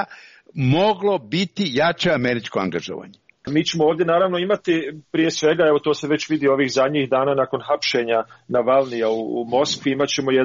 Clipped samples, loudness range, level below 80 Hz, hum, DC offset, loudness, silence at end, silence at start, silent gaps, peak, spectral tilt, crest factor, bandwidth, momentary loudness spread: under 0.1%; 2 LU; -60 dBFS; none; under 0.1%; -20 LUFS; 0 s; 0 s; none; -6 dBFS; -4 dB/octave; 14 dB; 7.4 kHz; 6 LU